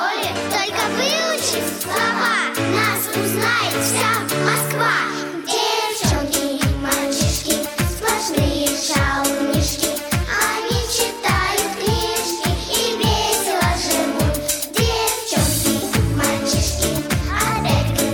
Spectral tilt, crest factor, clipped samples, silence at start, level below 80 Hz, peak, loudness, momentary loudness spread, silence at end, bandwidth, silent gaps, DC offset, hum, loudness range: -3.5 dB/octave; 16 dB; under 0.1%; 0 s; -32 dBFS; -2 dBFS; -19 LUFS; 3 LU; 0 s; 19.5 kHz; none; under 0.1%; none; 1 LU